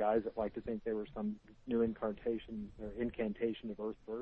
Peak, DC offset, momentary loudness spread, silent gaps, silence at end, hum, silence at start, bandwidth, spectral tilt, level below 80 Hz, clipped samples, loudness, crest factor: -22 dBFS; under 0.1%; 9 LU; none; 0 s; none; 0 s; 5 kHz; -9 dB/octave; -58 dBFS; under 0.1%; -39 LUFS; 16 dB